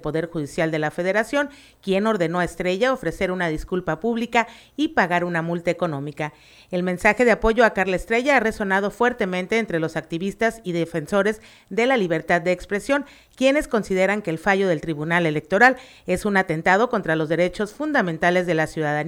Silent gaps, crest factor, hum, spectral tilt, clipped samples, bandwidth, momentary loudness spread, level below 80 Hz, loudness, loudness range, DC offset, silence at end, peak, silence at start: none; 18 dB; none; -5.5 dB/octave; under 0.1%; 16.5 kHz; 9 LU; -46 dBFS; -22 LUFS; 3 LU; under 0.1%; 0 s; -2 dBFS; 0 s